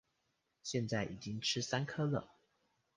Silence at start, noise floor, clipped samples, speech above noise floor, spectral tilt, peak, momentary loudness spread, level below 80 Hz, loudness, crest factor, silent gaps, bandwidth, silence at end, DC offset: 0.65 s; -83 dBFS; under 0.1%; 45 dB; -4.5 dB/octave; -20 dBFS; 6 LU; -70 dBFS; -38 LUFS; 20 dB; none; 10 kHz; 0.7 s; under 0.1%